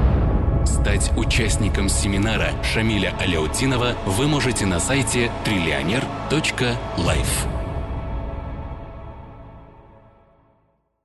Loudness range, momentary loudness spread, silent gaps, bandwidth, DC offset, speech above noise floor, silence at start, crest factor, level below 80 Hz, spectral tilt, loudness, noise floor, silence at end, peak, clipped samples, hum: 9 LU; 12 LU; none; 12.5 kHz; under 0.1%; 44 dB; 0 s; 14 dB; -26 dBFS; -4.5 dB/octave; -21 LUFS; -64 dBFS; 1.35 s; -8 dBFS; under 0.1%; none